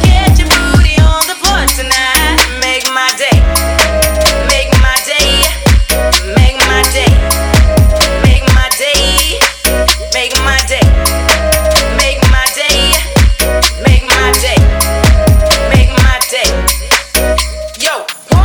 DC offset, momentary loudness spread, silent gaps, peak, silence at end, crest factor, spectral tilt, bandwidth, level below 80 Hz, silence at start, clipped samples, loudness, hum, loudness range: under 0.1%; 3 LU; none; 0 dBFS; 0 s; 8 dB; -3.5 dB/octave; over 20 kHz; -12 dBFS; 0 s; under 0.1%; -9 LUFS; none; 1 LU